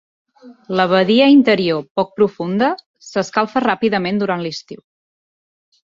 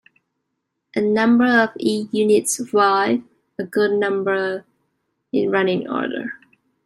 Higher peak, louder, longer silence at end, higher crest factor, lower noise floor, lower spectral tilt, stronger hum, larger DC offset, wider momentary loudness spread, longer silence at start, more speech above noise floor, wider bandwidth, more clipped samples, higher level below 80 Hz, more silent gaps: about the same, -2 dBFS vs -2 dBFS; first, -16 LUFS vs -19 LUFS; first, 1.2 s vs 0.5 s; about the same, 16 dB vs 18 dB; first, under -90 dBFS vs -76 dBFS; first, -6 dB/octave vs -4.5 dB/octave; neither; neither; about the same, 12 LU vs 13 LU; second, 0.45 s vs 0.95 s; first, over 74 dB vs 58 dB; second, 7.6 kHz vs 15 kHz; neither; first, -60 dBFS vs -66 dBFS; first, 1.91-1.95 s, 2.86-2.94 s vs none